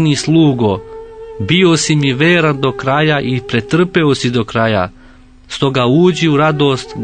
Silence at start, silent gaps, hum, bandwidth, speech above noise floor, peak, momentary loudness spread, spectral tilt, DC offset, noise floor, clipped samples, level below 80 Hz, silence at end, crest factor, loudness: 0 s; none; none; 9.4 kHz; 28 dB; 0 dBFS; 11 LU; -5.5 dB/octave; under 0.1%; -40 dBFS; under 0.1%; -44 dBFS; 0 s; 12 dB; -13 LUFS